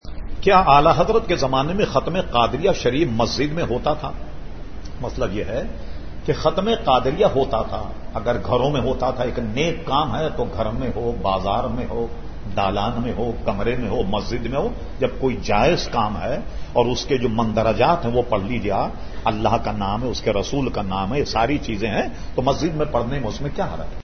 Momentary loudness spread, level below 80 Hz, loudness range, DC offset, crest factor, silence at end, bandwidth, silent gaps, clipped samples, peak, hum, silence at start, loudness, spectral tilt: 10 LU; -32 dBFS; 4 LU; 3%; 20 dB; 0 s; 6.6 kHz; none; under 0.1%; 0 dBFS; none; 0 s; -21 LUFS; -6 dB/octave